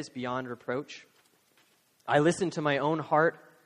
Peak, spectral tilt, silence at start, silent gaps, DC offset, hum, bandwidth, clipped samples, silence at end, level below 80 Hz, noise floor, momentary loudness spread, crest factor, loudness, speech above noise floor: -10 dBFS; -5.5 dB/octave; 0 s; none; under 0.1%; none; 11.5 kHz; under 0.1%; 0.3 s; -72 dBFS; -67 dBFS; 15 LU; 20 dB; -29 LUFS; 38 dB